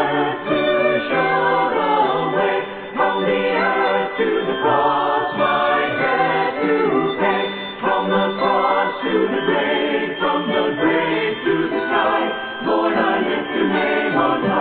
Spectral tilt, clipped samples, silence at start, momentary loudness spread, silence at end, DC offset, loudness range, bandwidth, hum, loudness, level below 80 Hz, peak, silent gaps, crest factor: -9.5 dB/octave; under 0.1%; 0 s; 4 LU; 0 s; under 0.1%; 1 LU; 4.7 kHz; none; -18 LUFS; -56 dBFS; -4 dBFS; none; 14 dB